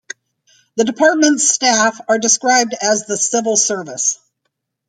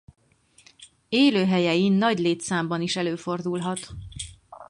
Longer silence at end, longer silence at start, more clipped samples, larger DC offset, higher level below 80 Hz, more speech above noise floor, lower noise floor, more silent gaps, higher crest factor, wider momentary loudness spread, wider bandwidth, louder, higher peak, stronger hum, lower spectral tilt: first, 0.75 s vs 0.05 s; about the same, 0.75 s vs 0.8 s; neither; neither; second, -66 dBFS vs -54 dBFS; first, 58 dB vs 34 dB; first, -73 dBFS vs -57 dBFS; neither; about the same, 16 dB vs 16 dB; second, 8 LU vs 17 LU; first, 12.5 kHz vs 11 kHz; first, -14 LUFS vs -23 LUFS; first, 0 dBFS vs -8 dBFS; neither; second, -1 dB/octave vs -5 dB/octave